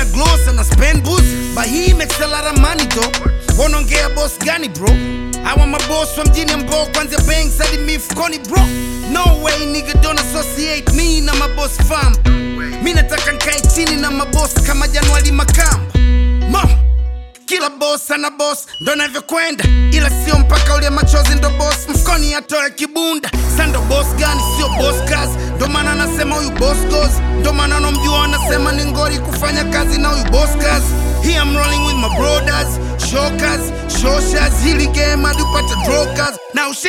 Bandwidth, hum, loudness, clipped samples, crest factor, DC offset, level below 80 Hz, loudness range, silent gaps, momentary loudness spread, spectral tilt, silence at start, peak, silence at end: 16.5 kHz; none; -14 LUFS; under 0.1%; 12 dB; under 0.1%; -16 dBFS; 2 LU; none; 5 LU; -4 dB/octave; 0 s; 0 dBFS; 0 s